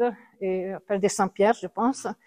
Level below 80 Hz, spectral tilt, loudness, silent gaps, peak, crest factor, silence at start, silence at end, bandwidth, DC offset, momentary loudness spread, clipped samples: -66 dBFS; -5 dB/octave; -26 LUFS; none; -8 dBFS; 18 dB; 0 s; 0.15 s; 15.5 kHz; under 0.1%; 7 LU; under 0.1%